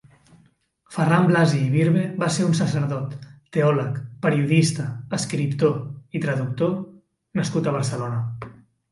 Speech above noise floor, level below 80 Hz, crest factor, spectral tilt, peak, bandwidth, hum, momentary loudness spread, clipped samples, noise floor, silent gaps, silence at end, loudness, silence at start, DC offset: 39 dB; -60 dBFS; 18 dB; -6.5 dB/octave; -4 dBFS; 11.5 kHz; none; 13 LU; under 0.1%; -60 dBFS; none; 0.4 s; -22 LUFS; 0.9 s; under 0.1%